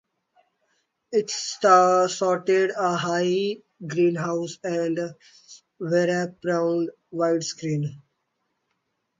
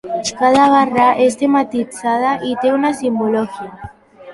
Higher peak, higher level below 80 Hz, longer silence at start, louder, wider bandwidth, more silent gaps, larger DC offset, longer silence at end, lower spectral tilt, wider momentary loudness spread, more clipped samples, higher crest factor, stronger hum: second, -4 dBFS vs 0 dBFS; second, -72 dBFS vs -52 dBFS; first, 1.1 s vs 0.05 s; second, -23 LUFS vs -15 LUFS; second, 9.4 kHz vs 11.5 kHz; neither; neither; first, 1.25 s vs 0 s; about the same, -5 dB/octave vs -4.5 dB/octave; about the same, 12 LU vs 10 LU; neither; first, 20 dB vs 14 dB; neither